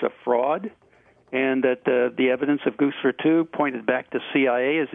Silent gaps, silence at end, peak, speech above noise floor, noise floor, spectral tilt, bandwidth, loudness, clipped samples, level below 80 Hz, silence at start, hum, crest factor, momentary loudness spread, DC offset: none; 0 s; -6 dBFS; 27 dB; -49 dBFS; -8.5 dB/octave; 3.8 kHz; -23 LUFS; under 0.1%; -72 dBFS; 0 s; none; 16 dB; 5 LU; under 0.1%